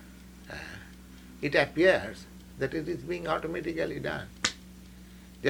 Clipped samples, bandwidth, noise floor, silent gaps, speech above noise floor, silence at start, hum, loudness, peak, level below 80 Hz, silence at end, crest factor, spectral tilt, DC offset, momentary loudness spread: under 0.1%; 19.5 kHz; -49 dBFS; none; 20 dB; 0 s; none; -30 LUFS; -8 dBFS; -52 dBFS; 0 s; 24 dB; -4.5 dB/octave; under 0.1%; 26 LU